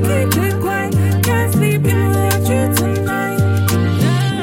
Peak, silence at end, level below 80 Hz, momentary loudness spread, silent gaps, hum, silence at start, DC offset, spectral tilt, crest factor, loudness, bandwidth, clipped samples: 0 dBFS; 0 s; -42 dBFS; 3 LU; none; none; 0 s; under 0.1%; -6 dB/octave; 14 dB; -15 LUFS; 17 kHz; under 0.1%